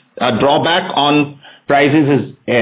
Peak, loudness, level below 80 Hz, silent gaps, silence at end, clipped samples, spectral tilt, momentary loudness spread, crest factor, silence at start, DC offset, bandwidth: 0 dBFS; -13 LUFS; -52 dBFS; none; 0 s; under 0.1%; -9.5 dB/octave; 6 LU; 14 dB; 0.15 s; under 0.1%; 4 kHz